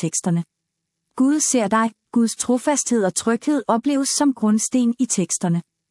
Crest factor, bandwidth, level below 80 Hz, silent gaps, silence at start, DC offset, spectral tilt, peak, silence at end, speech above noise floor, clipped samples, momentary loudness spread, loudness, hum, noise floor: 14 dB; 12 kHz; -68 dBFS; none; 0 s; under 0.1%; -4.5 dB/octave; -6 dBFS; 0.3 s; 59 dB; under 0.1%; 5 LU; -20 LUFS; none; -78 dBFS